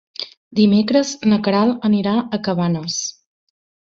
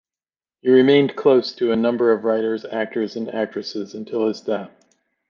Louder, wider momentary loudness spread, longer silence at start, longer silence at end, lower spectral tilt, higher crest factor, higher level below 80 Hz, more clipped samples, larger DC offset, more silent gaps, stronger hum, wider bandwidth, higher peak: about the same, -18 LUFS vs -20 LUFS; about the same, 10 LU vs 12 LU; second, 0.2 s vs 0.65 s; first, 0.85 s vs 0.6 s; about the same, -5.5 dB/octave vs -6.5 dB/octave; about the same, 16 dB vs 16 dB; first, -58 dBFS vs -66 dBFS; neither; neither; first, 0.37-0.51 s vs none; neither; about the same, 7.6 kHz vs 7 kHz; about the same, -2 dBFS vs -4 dBFS